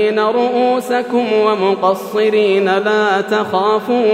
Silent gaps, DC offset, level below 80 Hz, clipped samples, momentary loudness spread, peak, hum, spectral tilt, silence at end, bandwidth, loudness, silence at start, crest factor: none; under 0.1%; -72 dBFS; under 0.1%; 3 LU; 0 dBFS; none; -5.5 dB/octave; 0 s; 15.5 kHz; -14 LUFS; 0 s; 14 dB